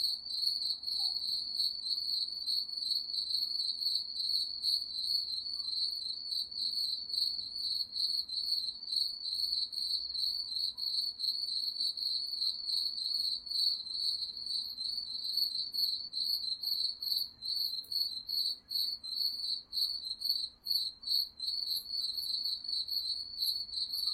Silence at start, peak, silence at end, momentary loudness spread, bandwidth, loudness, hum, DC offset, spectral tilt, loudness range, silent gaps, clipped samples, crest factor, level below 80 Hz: 0 s; -18 dBFS; 0 s; 3 LU; 16 kHz; -33 LUFS; none; under 0.1%; 1 dB/octave; 1 LU; none; under 0.1%; 18 dB; -72 dBFS